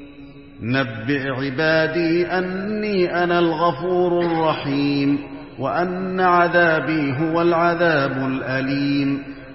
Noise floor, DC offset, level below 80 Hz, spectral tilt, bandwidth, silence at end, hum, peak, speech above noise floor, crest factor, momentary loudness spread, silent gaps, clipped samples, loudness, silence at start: -41 dBFS; 0.3%; -52 dBFS; -10 dB/octave; 5.8 kHz; 0 s; none; -4 dBFS; 21 dB; 16 dB; 7 LU; none; under 0.1%; -20 LUFS; 0 s